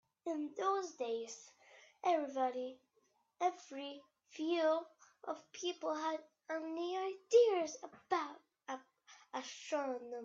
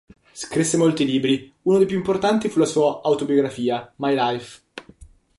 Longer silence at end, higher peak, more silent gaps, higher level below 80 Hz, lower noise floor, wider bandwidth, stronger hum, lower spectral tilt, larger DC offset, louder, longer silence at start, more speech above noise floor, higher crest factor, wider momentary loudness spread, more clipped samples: second, 0 s vs 0.3 s; second, -18 dBFS vs -6 dBFS; neither; second, under -90 dBFS vs -56 dBFS; first, -78 dBFS vs -48 dBFS; second, 7.8 kHz vs 11.5 kHz; neither; second, -2 dB/octave vs -5 dB/octave; neither; second, -39 LUFS vs -21 LUFS; about the same, 0.25 s vs 0.35 s; first, 40 dB vs 28 dB; first, 22 dB vs 16 dB; about the same, 16 LU vs 14 LU; neither